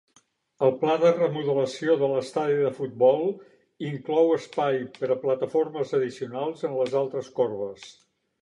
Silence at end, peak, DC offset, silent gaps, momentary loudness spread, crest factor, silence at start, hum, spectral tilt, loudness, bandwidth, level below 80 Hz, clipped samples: 0.5 s; -8 dBFS; under 0.1%; none; 10 LU; 16 dB; 0.6 s; none; -6.5 dB/octave; -25 LUFS; 11 kHz; -76 dBFS; under 0.1%